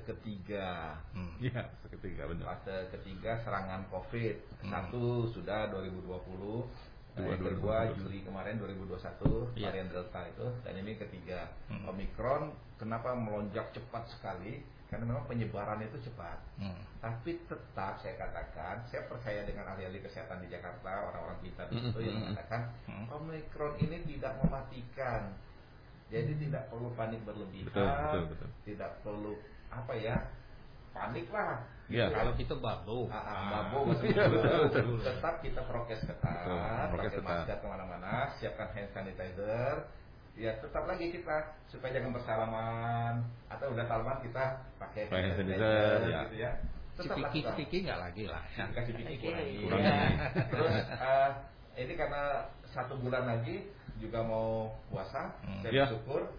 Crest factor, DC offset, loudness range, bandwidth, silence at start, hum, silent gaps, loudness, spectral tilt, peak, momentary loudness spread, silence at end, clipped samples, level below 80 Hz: 18 dB; under 0.1%; 9 LU; 5.2 kHz; 0 s; none; none; -37 LUFS; -5.5 dB/octave; -18 dBFS; 13 LU; 0 s; under 0.1%; -50 dBFS